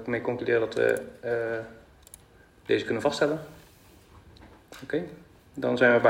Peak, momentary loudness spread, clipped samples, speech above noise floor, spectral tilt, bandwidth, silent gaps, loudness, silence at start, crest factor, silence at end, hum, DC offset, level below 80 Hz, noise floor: -6 dBFS; 21 LU; under 0.1%; 30 dB; -5.5 dB/octave; 16 kHz; none; -28 LUFS; 0 s; 22 dB; 0 s; none; under 0.1%; -60 dBFS; -56 dBFS